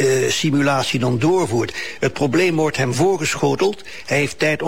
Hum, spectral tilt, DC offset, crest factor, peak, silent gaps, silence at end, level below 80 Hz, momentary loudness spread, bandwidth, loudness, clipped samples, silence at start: none; -5 dB/octave; 1%; 12 dB; -6 dBFS; none; 0 s; -52 dBFS; 5 LU; 16.5 kHz; -18 LUFS; under 0.1%; 0 s